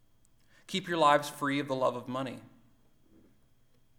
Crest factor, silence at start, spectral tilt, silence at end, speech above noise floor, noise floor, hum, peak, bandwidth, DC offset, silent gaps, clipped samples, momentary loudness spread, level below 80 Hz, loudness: 24 dB; 0.7 s; -4.5 dB/octave; 1.5 s; 34 dB; -64 dBFS; none; -10 dBFS; 18.5 kHz; under 0.1%; none; under 0.1%; 13 LU; -70 dBFS; -30 LUFS